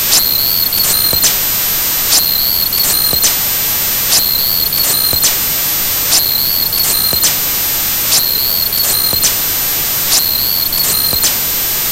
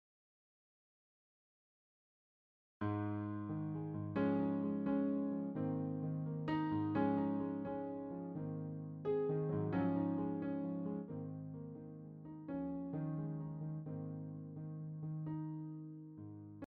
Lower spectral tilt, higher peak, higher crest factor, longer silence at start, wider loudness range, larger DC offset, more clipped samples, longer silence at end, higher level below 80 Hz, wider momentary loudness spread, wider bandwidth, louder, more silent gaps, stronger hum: second, 0 dB/octave vs -9 dB/octave; first, 0 dBFS vs -24 dBFS; second, 12 dB vs 18 dB; second, 0 s vs 2.8 s; second, 1 LU vs 7 LU; neither; neither; about the same, 0 s vs 0.05 s; first, -36 dBFS vs -72 dBFS; second, 3 LU vs 12 LU; first, over 20 kHz vs 4.8 kHz; first, -10 LUFS vs -41 LUFS; neither; first, 50 Hz at -35 dBFS vs none